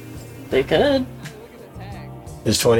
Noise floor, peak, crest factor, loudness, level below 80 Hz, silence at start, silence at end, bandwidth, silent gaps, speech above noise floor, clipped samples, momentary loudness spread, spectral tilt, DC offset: -38 dBFS; -4 dBFS; 18 dB; -20 LUFS; -44 dBFS; 0 s; 0 s; 18 kHz; none; 21 dB; under 0.1%; 20 LU; -4.5 dB/octave; under 0.1%